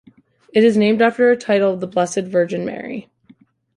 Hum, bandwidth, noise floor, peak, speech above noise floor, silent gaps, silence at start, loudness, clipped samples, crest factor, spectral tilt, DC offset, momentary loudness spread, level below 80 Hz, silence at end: none; 11.5 kHz; -52 dBFS; -2 dBFS; 35 dB; none; 0.55 s; -17 LUFS; under 0.1%; 16 dB; -5.5 dB/octave; under 0.1%; 13 LU; -64 dBFS; 0.75 s